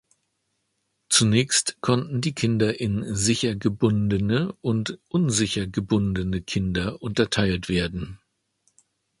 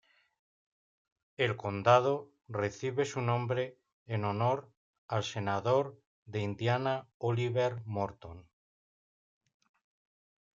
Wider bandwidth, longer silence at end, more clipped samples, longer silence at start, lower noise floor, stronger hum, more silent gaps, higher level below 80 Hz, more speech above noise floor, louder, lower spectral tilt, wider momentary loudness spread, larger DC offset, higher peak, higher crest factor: first, 11.5 kHz vs 7.6 kHz; second, 1.05 s vs 2.15 s; neither; second, 1.1 s vs 1.4 s; second, -75 dBFS vs under -90 dBFS; neither; second, none vs 3.92-4.06 s, 4.77-5.09 s, 6.07-6.26 s, 7.14-7.20 s; first, -44 dBFS vs -72 dBFS; second, 51 dB vs over 58 dB; first, -23 LUFS vs -33 LUFS; second, -4.5 dB/octave vs -6 dB/octave; second, 7 LU vs 11 LU; neither; first, -4 dBFS vs -10 dBFS; about the same, 20 dB vs 24 dB